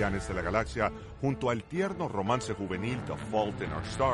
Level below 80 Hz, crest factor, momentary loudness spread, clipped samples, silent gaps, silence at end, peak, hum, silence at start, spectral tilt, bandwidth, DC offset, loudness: -46 dBFS; 18 dB; 4 LU; under 0.1%; none; 0 s; -12 dBFS; none; 0 s; -6 dB/octave; 11.5 kHz; under 0.1%; -32 LUFS